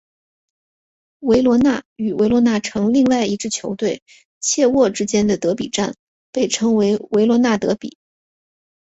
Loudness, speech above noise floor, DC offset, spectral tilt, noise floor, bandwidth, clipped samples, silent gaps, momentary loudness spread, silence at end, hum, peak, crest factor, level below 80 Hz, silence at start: -18 LUFS; over 73 dB; under 0.1%; -4.5 dB/octave; under -90 dBFS; 8.2 kHz; under 0.1%; 1.85-1.96 s, 4.02-4.06 s, 4.25-4.41 s, 5.99-6.33 s; 9 LU; 0.9 s; none; -2 dBFS; 16 dB; -52 dBFS; 1.2 s